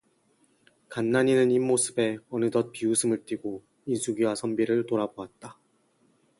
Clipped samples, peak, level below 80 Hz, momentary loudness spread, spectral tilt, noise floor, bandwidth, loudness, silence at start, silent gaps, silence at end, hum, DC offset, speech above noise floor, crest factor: under 0.1%; -10 dBFS; -70 dBFS; 16 LU; -4.5 dB/octave; -67 dBFS; 11.5 kHz; -26 LUFS; 0.9 s; none; 0.9 s; none; under 0.1%; 41 dB; 18 dB